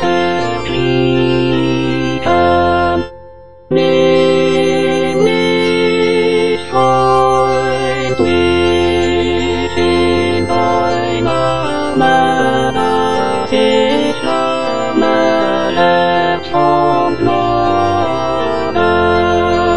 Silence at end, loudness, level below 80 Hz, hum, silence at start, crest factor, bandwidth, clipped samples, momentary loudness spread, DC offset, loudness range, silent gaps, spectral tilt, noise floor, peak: 0 s; -13 LUFS; -36 dBFS; none; 0 s; 12 dB; 10 kHz; under 0.1%; 5 LU; 4%; 1 LU; none; -5.5 dB/octave; -37 dBFS; 0 dBFS